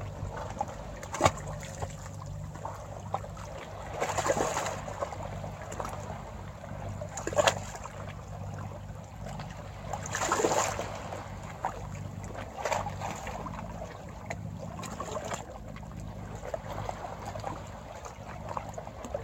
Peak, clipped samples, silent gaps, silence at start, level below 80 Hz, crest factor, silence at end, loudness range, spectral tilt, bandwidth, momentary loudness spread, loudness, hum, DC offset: -6 dBFS; under 0.1%; none; 0 s; -50 dBFS; 30 dB; 0 s; 6 LU; -4 dB/octave; 16.5 kHz; 14 LU; -36 LUFS; none; under 0.1%